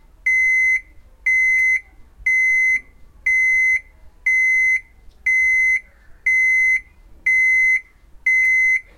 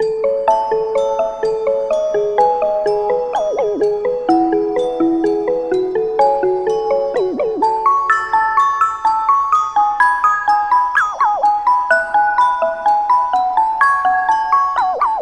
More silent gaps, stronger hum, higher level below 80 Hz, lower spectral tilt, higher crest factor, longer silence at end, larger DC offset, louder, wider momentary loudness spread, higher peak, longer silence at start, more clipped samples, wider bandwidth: neither; neither; about the same, -48 dBFS vs -50 dBFS; second, 0 dB/octave vs -4.5 dB/octave; about the same, 10 dB vs 14 dB; first, 0.15 s vs 0 s; neither; about the same, -16 LUFS vs -15 LUFS; first, 8 LU vs 4 LU; second, -8 dBFS vs 0 dBFS; first, 0.25 s vs 0 s; neither; first, 15 kHz vs 10 kHz